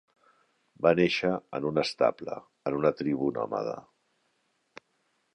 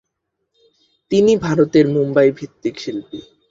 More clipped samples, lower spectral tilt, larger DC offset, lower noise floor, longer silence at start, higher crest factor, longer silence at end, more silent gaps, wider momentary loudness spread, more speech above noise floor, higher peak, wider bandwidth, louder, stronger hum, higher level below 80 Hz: neither; about the same, -6 dB/octave vs -7 dB/octave; neither; about the same, -74 dBFS vs -75 dBFS; second, 0.8 s vs 1.1 s; first, 22 dB vs 16 dB; first, 1.55 s vs 0.3 s; neither; second, 12 LU vs 15 LU; second, 46 dB vs 59 dB; second, -8 dBFS vs -2 dBFS; first, 10.5 kHz vs 7.6 kHz; second, -28 LUFS vs -16 LUFS; neither; second, -64 dBFS vs -54 dBFS